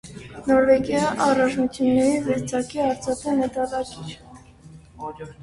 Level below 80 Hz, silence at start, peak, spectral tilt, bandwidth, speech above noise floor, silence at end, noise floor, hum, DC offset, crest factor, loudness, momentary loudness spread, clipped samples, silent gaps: -50 dBFS; 0.05 s; -6 dBFS; -5.5 dB/octave; 11.5 kHz; 25 dB; 0 s; -46 dBFS; none; under 0.1%; 16 dB; -22 LUFS; 18 LU; under 0.1%; none